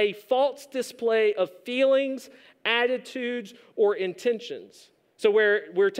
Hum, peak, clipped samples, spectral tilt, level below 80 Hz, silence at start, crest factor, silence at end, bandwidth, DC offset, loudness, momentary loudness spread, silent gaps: none; -8 dBFS; under 0.1%; -3.5 dB/octave; -86 dBFS; 0 s; 18 dB; 0 s; 15.5 kHz; under 0.1%; -25 LUFS; 11 LU; none